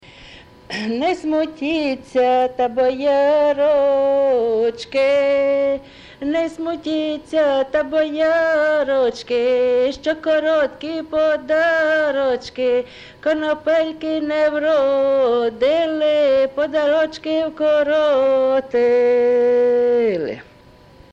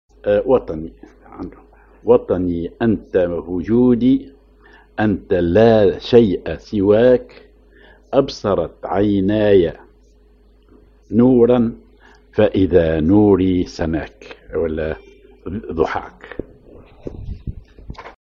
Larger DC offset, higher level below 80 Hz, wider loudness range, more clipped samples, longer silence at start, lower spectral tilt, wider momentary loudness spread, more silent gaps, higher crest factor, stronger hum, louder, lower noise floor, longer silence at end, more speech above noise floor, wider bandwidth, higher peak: neither; second, -54 dBFS vs -38 dBFS; second, 3 LU vs 9 LU; neither; about the same, 0.2 s vs 0.25 s; second, -5 dB/octave vs -8.5 dB/octave; second, 7 LU vs 20 LU; neither; second, 10 dB vs 18 dB; neither; about the same, -18 LUFS vs -16 LUFS; second, -46 dBFS vs -50 dBFS; first, 0.7 s vs 0.15 s; second, 29 dB vs 34 dB; first, 8.8 kHz vs 7 kHz; second, -8 dBFS vs 0 dBFS